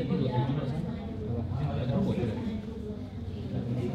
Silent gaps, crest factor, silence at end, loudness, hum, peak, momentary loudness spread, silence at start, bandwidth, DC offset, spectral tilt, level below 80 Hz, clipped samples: none; 16 dB; 0 s; -32 LUFS; none; -16 dBFS; 9 LU; 0 s; 8.4 kHz; under 0.1%; -9 dB/octave; -48 dBFS; under 0.1%